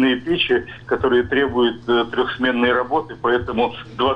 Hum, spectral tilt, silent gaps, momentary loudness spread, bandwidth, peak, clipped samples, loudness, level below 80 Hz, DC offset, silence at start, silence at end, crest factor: none; -7 dB/octave; none; 5 LU; 5.6 kHz; -8 dBFS; under 0.1%; -19 LUFS; -46 dBFS; under 0.1%; 0 s; 0 s; 12 dB